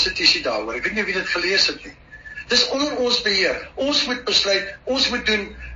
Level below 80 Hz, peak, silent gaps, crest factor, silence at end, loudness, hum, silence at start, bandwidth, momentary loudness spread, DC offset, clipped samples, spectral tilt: -46 dBFS; -2 dBFS; none; 20 dB; 0 s; -19 LUFS; none; 0 s; 7.4 kHz; 8 LU; under 0.1%; under 0.1%; 0 dB/octave